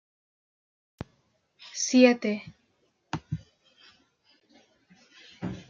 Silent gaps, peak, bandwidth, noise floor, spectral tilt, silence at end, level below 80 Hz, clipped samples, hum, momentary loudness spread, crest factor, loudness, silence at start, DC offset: none; -6 dBFS; 7.6 kHz; -71 dBFS; -4.5 dB/octave; 0.1 s; -62 dBFS; under 0.1%; none; 26 LU; 24 dB; -26 LUFS; 1.6 s; under 0.1%